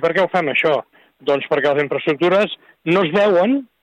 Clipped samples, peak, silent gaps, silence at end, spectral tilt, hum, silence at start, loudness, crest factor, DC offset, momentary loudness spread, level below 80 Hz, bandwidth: under 0.1%; -6 dBFS; none; 0.2 s; -6.5 dB/octave; none; 0 s; -17 LUFS; 12 dB; under 0.1%; 7 LU; -64 dBFS; 9.4 kHz